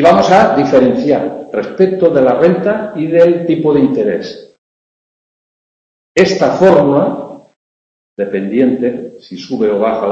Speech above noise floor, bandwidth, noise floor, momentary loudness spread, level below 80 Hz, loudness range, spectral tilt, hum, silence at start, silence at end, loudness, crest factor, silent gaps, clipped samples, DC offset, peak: over 79 dB; 8.2 kHz; under -90 dBFS; 13 LU; -50 dBFS; 4 LU; -6.5 dB/octave; none; 0 s; 0 s; -12 LUFS; 12 dB; 4.58-6.15 s, 7.56-8.16 s; 0.2%; under 0.1%; 0 dBFS